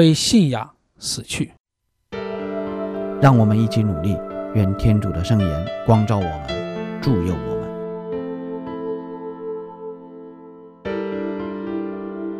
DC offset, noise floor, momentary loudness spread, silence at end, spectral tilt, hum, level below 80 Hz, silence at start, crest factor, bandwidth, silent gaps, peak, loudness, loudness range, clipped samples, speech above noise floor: under 0.1%; -45 dBFS; 16 LU; 0 s; -6 dB/octave; none; -40 dBFS; 0 s; 18 dB; 14 kHz; 1.60-1.64 s; -2 dBFS; -22 LUFS; 11 LU; under 0.1%; 27 dB